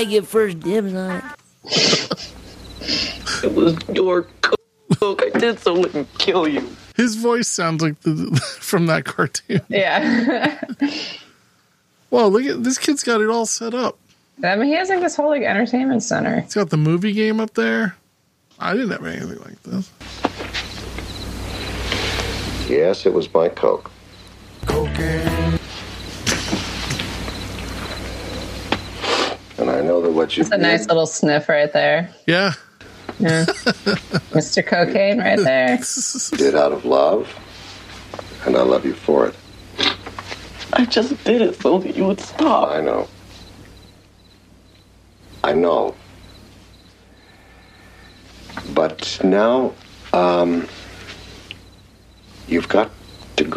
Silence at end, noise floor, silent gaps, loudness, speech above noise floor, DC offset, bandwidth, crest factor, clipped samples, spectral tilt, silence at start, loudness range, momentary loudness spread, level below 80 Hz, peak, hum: 0 s; -61 dBFS; none; -19 LUFS; 43 dB; under 0.1%; 15 kHz; 20 dB; under 0.1%; -4.5 dB/octave; 0 s; 7 LU; 14 LU; -42 dBFS; 0 dBFS; none